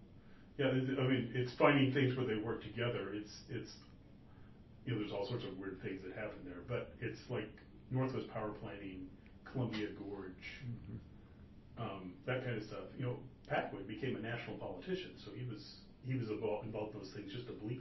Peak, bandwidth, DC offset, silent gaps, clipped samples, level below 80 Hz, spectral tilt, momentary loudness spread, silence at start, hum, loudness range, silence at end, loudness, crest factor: -14 dBFS; 6 kHz; under 0.1%; none; under 0.1%; -64 dBFS; -5.5 dB/octave; 19 LU; 0 s; none; 10 LU; 0 s; -41 LUFS; 26 dB